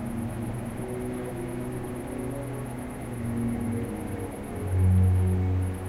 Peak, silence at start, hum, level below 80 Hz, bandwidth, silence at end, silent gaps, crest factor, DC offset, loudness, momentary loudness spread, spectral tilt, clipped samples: -14 dBFS; 0 s; none; -44 dBFS; 13 kHz; 0 s; none; 14 dB; under 0.1%; -30 LUFS; 12 LU; -8 dB/octave; under 0.1%